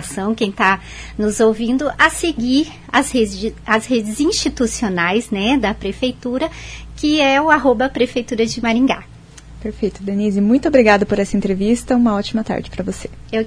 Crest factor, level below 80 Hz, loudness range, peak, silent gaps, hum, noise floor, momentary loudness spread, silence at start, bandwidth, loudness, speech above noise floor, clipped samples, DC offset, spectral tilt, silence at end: 18 dB; -38 dBFS; 2 LU; 0 dBFS; none; none; -38 dBFS; 10 LU; 0 s; 11 kHz; -17 LUFS; 21 dB; under 0.1%; under 0.1%; -4.5 dB/octave; 0 s